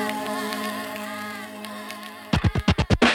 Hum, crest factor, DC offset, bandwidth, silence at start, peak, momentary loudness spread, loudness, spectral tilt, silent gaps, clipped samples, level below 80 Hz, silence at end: none; 20 dB; under 0.1%; 17.5 kHz; 0 s; -6 dBFS; 13 LU; -27 LUFS; -5 dB/octave; none; under 0.1%; -36 dBFS; 0 s